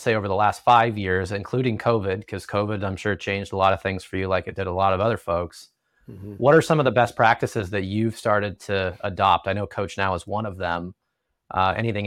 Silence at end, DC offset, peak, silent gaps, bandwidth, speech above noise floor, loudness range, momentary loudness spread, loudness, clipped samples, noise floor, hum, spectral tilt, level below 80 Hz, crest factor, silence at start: 0 s; under 0.1%; -4 dBFS; none; 15 kHz; 55 dB; 3 LU; 10 LU; -23 LUFS; under 0.1%; -77 dBFS; none; -6 dB/octave; -56 dBFS; 18 dB; 0 s